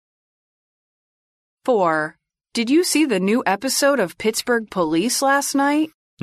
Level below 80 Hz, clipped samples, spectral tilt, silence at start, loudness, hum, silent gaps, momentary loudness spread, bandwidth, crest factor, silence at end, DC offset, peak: -62 dBFS; under 0.1%; -3.5 dB/octave; 1.65 s; -19 LUFS; none; none; 7 LU; 14 kHz; 14 dB; 0.35 s; under 0.1%; -6 dBFS